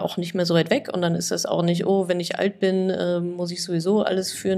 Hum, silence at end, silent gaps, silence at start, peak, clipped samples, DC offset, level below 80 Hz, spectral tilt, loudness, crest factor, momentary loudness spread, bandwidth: none; 0 s; none; 0 s; -6 dBFS; under 0.1%; under 0.1%; -66 dBFS; -5 dB/octave; -23 LUFS; 16 dB; 5 LU; 14.5 kHz